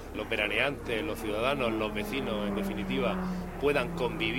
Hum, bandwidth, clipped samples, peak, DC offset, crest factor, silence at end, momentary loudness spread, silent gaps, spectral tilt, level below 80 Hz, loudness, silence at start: none; 16.5 kHz; under 0.1%; -10 dBFS; under 0.1%; 20 dB; 0 s; 5 LU; none; -5.5 dB/octave; -46 dBFS; -31 LUFS; 0 s